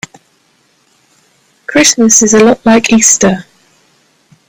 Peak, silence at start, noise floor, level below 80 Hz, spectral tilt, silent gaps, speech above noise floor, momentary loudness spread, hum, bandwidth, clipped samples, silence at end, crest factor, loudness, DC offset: 0 dBFS; 1.7 s; -53 dBFS; -48 dBFS; -2.5 dB/octave; none; 46 dB; 15 LU; none; over 20 kHz; 0.4%; 1.05 s; 12 dB; -7 LUFS; under 0.1%